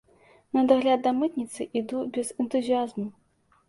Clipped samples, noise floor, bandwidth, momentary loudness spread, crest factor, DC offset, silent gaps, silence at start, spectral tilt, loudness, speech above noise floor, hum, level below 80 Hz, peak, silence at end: under 0.1%; -59 dBFS; 11.5 kHz; 11 LU; 20 dB; under 0.1%; none; 0.55 s; -5 dB/octave; -26 LUFS; 33 dB; none; -70 dBFS; -8 dBFS; 0.55 s